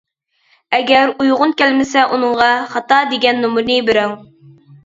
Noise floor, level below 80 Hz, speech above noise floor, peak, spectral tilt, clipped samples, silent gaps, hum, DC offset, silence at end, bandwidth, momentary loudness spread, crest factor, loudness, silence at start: -58 dBFS; -56 dBFS; 45 dB; 0 dBFS; -3.5 dB/octave; under 0.1%; none; none; under 0.1%; 0.65 s; 7.8 kHz; 6 LU; 14 dB; -14 LUFS; 0.7 s